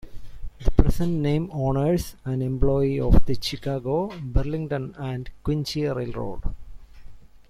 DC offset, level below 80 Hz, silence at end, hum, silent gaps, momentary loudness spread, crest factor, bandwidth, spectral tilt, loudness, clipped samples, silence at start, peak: under 0.1%; -30 dBFS; 0.3 s; none; none; 10 LU; 20 dB; 14.5 kHz; -7 dB/octave; -26 LUFS; under 0.1%; 0.05 s; -2 dBFS